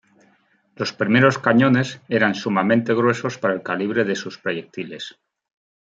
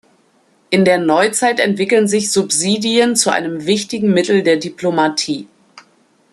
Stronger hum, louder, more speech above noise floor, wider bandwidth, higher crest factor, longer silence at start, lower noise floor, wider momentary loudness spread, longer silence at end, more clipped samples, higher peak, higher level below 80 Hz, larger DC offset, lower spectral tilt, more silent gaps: neither; second, -20 LUFS vs -15 LUFS; about the same, 41 dB vs 41 dB; second, 7.8 kHz vs 13 kHz; about the same, 20 dB vs 16 dB; about the same, 0.8 s vs 0.7 s; first, -61 dBFS vs -56 dBFS; first, 14 LU vs 6 LU; first, 0.8 s vs 0.5 s; neither; about the same, -2 dBFS vs 0 dBFS; about the same, -66 dBFS vs -62 dBFS; neither; first, -6 dB/octave vs -3.5 dB/octave; neither